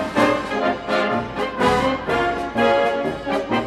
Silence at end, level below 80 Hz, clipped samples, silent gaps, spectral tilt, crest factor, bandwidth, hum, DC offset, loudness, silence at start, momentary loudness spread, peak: 0 s; -44 dBFS; under 0.1%; none; -5.5 dB/octave; 16 dB; 14 kHz; none; under 0.1%; -20 LUFS; 0 s; 6 LU; -4 dBFS